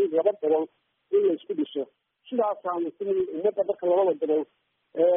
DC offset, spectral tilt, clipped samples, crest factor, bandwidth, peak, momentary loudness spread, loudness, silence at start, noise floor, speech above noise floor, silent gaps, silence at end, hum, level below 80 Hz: under 0.1%; -5 dB/octave; under 0.1%; 16 dB; 3.7 kHz; -10 dBFS; 10 LU; -26 LUFS; 0 s; -49 dBFS; 23 dB; none; 0 s; none; -76 dBFS